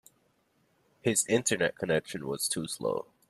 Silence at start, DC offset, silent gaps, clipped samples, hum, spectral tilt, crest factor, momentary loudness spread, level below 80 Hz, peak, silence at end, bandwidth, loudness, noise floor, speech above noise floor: 1.05 s; under 0.1%; none; under 0.1%; none; -3 dB/octave; 20 dB; 8 LU; -68 dBFS; -12 dBFS; 0.25 s; 14.5 kHz; -30 LUFS; -71 dBFS; 41 dB